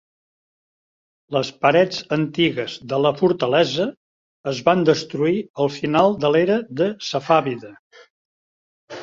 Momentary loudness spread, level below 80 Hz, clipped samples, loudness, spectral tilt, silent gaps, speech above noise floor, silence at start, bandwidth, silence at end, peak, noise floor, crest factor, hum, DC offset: 10 LU; -60 dBFS; under 0.1%; -20 LUFS; -6 dB/octave; 3.97-4.44 s, 5.50-5.54 s, 7.79-7.91 s, 8.10-8.88 s; over 71 dB; 1.3 s; 7.6 kHz; 0 s; -2 dBFS; under -90 dBFS; 20 dB; none; under 0.1%